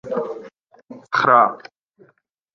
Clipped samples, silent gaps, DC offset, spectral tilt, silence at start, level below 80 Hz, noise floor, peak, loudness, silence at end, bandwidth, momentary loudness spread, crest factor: under 0.1%; none; under 0.1%; -5.5 dB/octave; 0.05 s; -68 dBFS; -61 dBFS; -2 dBFS; -18 LUFS; 1 s; 7.2 kHz; 21 LU; 20 dB